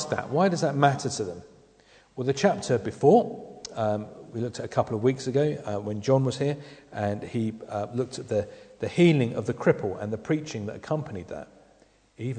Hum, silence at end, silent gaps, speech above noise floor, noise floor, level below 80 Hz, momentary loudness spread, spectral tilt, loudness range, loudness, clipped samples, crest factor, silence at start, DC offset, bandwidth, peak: none; 0 s; none; 34 dB; -60 dBFS; -62 dBFS; 15 LU; -6.5 dB/octave; 3 LU; -27 LUFS; under 0.1%; 20 dB; 0 s; under 0.1%; 9.4 kHz; -6 dBFS